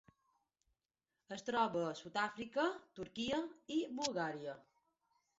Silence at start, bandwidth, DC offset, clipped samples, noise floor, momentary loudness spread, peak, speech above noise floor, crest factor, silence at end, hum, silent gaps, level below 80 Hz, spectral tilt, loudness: 1.3 s; 7.6 kHz; under 0.1%; under 0.1%; under -90 dBFS; 12 LU; -22 dBFS; over 50 dB; 22 dB; 0.75 s; none; none; -76 dBFS; -2.5 dB/octave; -40 LUFS